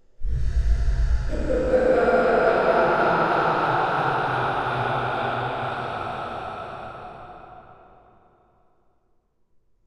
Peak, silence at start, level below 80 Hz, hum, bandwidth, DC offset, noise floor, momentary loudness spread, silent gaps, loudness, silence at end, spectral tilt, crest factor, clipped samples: -6 dBFS; 0.2 s; -30 dBFS; none; 10 kHz; under 0.1%; -65 dBFS; 16 LU; none; -23 LUFS; 2.15 s; -7 dB/octave; 16 dB; under 0.1%